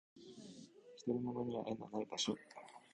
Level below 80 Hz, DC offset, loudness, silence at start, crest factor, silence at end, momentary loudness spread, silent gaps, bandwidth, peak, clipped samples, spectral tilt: -78 dBFS; under 0.1%; -42 LUFS; 0.15 s; 20 dB; 0.05 s; 18 LU; none; 11 kHz; -26 dBFS; under 0.1%; -4.5 dB/octave